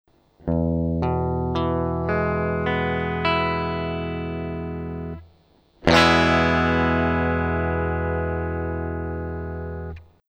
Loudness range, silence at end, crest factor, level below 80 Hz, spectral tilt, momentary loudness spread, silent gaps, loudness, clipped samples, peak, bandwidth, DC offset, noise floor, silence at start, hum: 5 LU; 0.3 s; 24 dB; -36 dBFS; -6.5 dB/octave; 14 LU; none; -23 LUFS; under 0.1%; 0 dBFS; 10 kHz; under 0.1%; -58 dBFS; 0.45 s; none